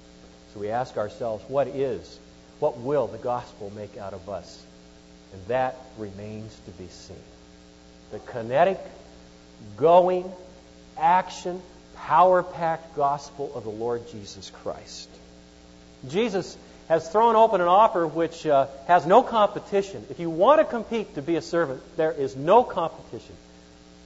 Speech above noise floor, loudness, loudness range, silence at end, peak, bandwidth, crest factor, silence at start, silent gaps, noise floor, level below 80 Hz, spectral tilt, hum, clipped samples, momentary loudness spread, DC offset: 26 dB; -23 LUFS; 13 LU; 0.7 s; -4 dBFS; 8 kHz; 20 dB; 0.55 s; none; -50 dBFS; -56 dBFS; -6 dB/octave; none; under 0.1%; 23 LU; under 0.1%